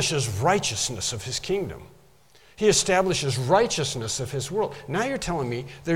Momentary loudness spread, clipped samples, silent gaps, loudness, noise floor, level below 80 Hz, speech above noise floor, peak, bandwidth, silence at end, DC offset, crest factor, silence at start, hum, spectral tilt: 8 LU; under 0.1%; none; -24 LUFS; -56 dBFS; -50 dBFS; 32 dB; -6 dBFS; 16.5 kHz; 0 s; 0.1%; 20 dB; 0 s; none; -3.5 dB/octave